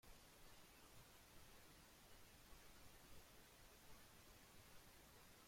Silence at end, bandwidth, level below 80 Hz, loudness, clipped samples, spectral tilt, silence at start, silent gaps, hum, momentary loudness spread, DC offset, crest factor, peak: 0 s; 16.5 kHz; -74 dBFS; -66 LUFS; under 0.1%; -3 dB/octave; 0.05 s; none; none; 1 LU; under 0.1%; 14 dB; -50 dBFS